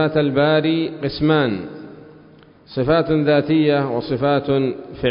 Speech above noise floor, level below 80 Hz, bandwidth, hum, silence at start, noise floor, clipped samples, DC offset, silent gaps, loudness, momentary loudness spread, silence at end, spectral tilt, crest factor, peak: 29 dB; -48 dBFS; 5.4 kHz; none; 0 s; -47 dBFS; under 0.1%; under 0.1%; none; -18 LUFS; 8 LU; 0 s; -12 dB/octave; 14 dB; -6 dBFS